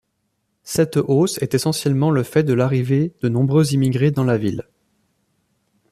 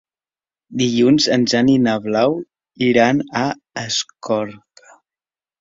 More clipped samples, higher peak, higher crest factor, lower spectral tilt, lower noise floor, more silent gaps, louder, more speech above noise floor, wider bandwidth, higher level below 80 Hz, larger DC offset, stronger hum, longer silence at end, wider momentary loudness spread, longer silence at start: neither; second, -4 dBFS vs 0 dBFS; about the same, 16 dB vs 18 dB; first, -6.5 dB/octave vs -4.5 dB/octave; second, -71 dBFS vs under -90 dBFS; neither; about the same, -18 LUFS vs -17 LUFS; second, 54 dB vs over 73 dB; first, 14.5 kHz vs 7.8 kHz; about the same, -56 dBFS vs -58 dBFS; neither; neither; first, 1.3 s vs 1.05 s; second, 4 LU vs 10 LU; about the same, 0.65 s vs 0.7 s